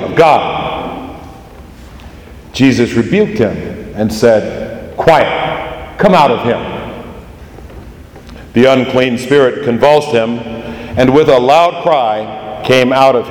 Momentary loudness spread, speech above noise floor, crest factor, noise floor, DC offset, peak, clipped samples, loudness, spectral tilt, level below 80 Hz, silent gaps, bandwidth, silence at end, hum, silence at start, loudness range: 16 LU; 23 dB; 12 dB; -33 dBFS; under 0.1%; 0 dBFS; 0.6%; -11 LUFS; -6 dB/octave; -38 dBFS; none; 18.5 kHz; 0 s; none; 0 s; 5 LU